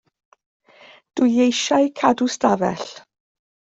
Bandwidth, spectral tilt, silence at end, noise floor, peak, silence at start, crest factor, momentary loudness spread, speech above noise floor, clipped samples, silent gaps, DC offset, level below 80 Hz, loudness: 8 kHz; -4 dB/octave; 0.7 s; -49 dBFS; -4 dBFS; 1.15 s; 18 dB; 14 LU; 31 dB; under 0.1%; none; under 0.1%; -62 dBFS; -19 LUFS